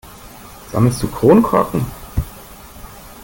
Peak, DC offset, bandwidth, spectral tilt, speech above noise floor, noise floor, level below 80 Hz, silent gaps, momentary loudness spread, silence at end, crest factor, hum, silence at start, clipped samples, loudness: -2 dBFS; under 0.1%; 17 kHz; -7.5 dB/octave; 24 dB; -38 dBFS; -34 dBFS; none; 25 LU; 0 s; 16 dB; none; 0.05 s; under 0.1%; -16 LUFS